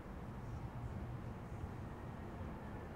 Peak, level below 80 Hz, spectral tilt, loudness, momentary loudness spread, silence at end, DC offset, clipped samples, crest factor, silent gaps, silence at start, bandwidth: -34 dBFS; -54 dBFS; -8 dB/octave; -49 LUFS; 2 LU; 0 s; under 0.1%; under 0.1%; 14 dB; none; 0 s; 16 kHz